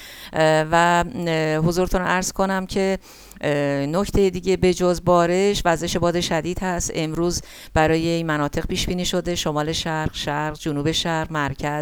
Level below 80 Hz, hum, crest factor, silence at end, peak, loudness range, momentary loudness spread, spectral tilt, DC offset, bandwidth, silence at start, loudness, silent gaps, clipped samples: -36 dBFS; none; 18 dB; 0 s; -4 dBFS; 3 LU; 7 LU; -4.5 dB/octave; under 0.1%; 19 kHz; 0 s; -21 LUFS; none; under 0.1%